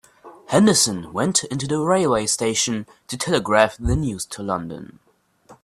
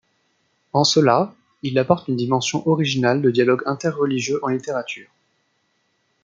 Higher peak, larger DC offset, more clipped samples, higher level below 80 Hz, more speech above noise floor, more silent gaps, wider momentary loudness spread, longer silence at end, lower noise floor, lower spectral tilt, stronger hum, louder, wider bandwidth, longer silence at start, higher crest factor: about the same, 0 dBFS vs -2 dBFS; neither; neither; first, -40 dBFS vs -64 dBFS; second, 31 dB vs 49 dB; neither; about the same, 12 LU vs 10 LU; second, 0.1 s vs 1.2 s; second, -52 dBFS vs -68 dBFS; second, -3.5 dB/octave vs -5 dB/octave; neither; about the same, -20 LUFS vs -20 LUFS; first, 14 kHz vs 9.2 kHz; second, 0.25 s vs 0.75 s; about the same, 22 dB vs 18 dB